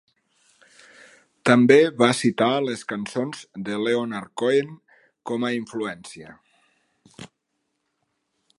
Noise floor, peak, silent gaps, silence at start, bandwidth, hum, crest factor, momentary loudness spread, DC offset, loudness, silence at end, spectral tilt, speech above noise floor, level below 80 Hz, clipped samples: -76 dBFS; -2 dBFS; none; 1.45 s; 11.5 kHz; none; 22 dB; 19 LU; under 0.1%; -22 LUFS; 1.3 s; -5 dB/octave; 55 dB; -70 dBFS; under 0.1%